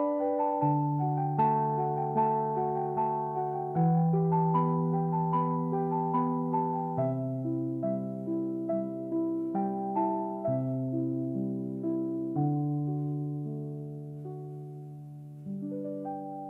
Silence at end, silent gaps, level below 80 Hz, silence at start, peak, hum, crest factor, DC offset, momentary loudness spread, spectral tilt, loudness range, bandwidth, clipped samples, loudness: 0 s; none; -70 dBFS; 0 s; -16 dBFS; none; 14 dB; under 0.1%; 12 LU; -12 dB/octave; 6 LU; 3.1 kHz; under 0.1%; -30 LUFS